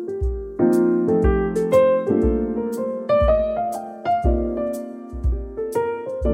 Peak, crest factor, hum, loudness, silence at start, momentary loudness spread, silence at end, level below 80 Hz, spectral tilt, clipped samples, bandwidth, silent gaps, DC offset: -6 dBFS; 14 dB; none; -21 LUFS; 0 s; 10 LU; 0 s; -28 dBFS; -8.5 dB/octave; under 0.1%; 16 kHz; none; under 0.1%